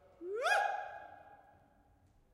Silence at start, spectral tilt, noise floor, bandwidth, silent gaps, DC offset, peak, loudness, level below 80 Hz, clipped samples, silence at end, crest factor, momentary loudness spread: 0.2 s; -1.5 dB/octave; -68 dBFS; 15 kHz; none; under 0.1%; -20 dBFS; -36 LUFS; -76 dBFS; under 0.1%; 0.95 s; 20 dB; 23 LU